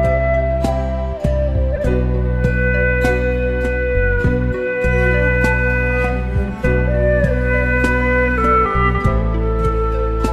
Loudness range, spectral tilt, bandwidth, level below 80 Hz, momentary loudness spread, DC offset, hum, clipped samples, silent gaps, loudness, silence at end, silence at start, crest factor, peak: 2 LU; -8 dB/octave; 9.4 kHz; -20 dBFS; 4 LU; under 0.1%; none; under 0.1%; none; -17 LUFS; 0 s; 0 s; 14 dB; -2 dBFS